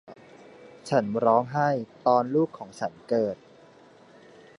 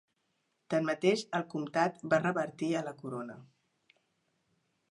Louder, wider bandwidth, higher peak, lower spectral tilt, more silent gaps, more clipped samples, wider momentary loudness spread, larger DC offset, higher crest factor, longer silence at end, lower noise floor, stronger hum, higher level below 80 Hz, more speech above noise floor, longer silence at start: first, -26 LUFS vs -33 LUFS; about the same, 11 kHz vs 11.5 kHz; first, -8 dBFS vs -12 dBFS; first, -7 dB/octave vs -5.5 dB/octave; neither; neither; about the same, 12 LU vs 12 LU; neither; about the same, 20 dB vs 22 dB; second, 1.25 s vs 1.45 s; second, -53 dBFS vs -79 dBFS; neither; first, -70 dBFS vs -82 dBFS; second, 28 dB vs 47 dB; second, 0.1 s vs 0.7 s